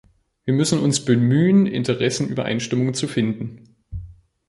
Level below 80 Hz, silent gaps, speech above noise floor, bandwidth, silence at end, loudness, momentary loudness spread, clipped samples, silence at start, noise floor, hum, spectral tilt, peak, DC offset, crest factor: -48 dBFS; none; 21 dB; 11.5 kHz; 0.35 s; -20 LUFS; 18 LU; under 0.1%; 0.45 s; -40 dBFS; none; -5.5 dB/octave; -4 dBFS; under 0.1%; 16 dB